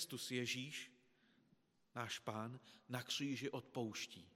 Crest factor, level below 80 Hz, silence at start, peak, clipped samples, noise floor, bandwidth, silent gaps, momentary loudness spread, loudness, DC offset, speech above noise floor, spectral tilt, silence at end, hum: 20 dB; under -90 dBFS; 0 s; -28 dBFS; under 0.1%; -77 dBFS; 16 kHz; none; 10 LU; -46 LUFS; under 0.1%; 30 dB; -3.5 dB/octave; 0.05 s; none